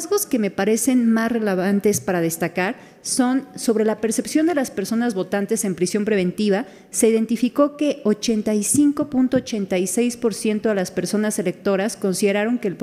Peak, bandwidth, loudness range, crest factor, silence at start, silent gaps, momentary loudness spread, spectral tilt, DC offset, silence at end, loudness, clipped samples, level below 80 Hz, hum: -4 dBFS; 16 kHz; 2 LU; 16 dB; 0 s; none; 5 LU; -4.5 dB/octave; under 0.1%; 0 s; -20 LUFS; under 0.1%; -60 dBFS; none